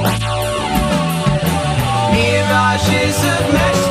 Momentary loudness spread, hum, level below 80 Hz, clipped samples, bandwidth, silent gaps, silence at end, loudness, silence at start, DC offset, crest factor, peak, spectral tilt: 4 LU; none; -30 dBFS; under 0.1%; 16 kHz; none; 0 s; -15 LUFS; 0 s; under 0.1%; 12 dB; -2 dBFS; -5 dB/octave